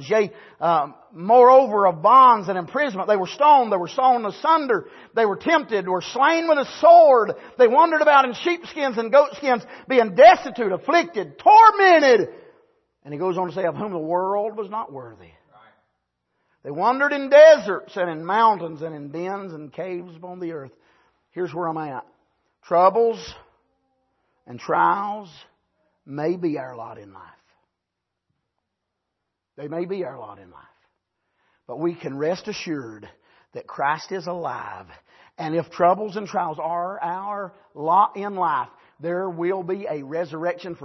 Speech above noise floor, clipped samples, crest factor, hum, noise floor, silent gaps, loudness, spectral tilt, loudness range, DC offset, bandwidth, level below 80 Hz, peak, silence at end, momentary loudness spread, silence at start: 62 dB; under 0.1%; 18 dB; none; -82 dBFS; none; -19 LUFS; -5.5 dB/octave; 16 LU; under 0.1%; 6.2 kHz; -68 dBFS; -2 dBFS; 0 s; 21 LU; 0 s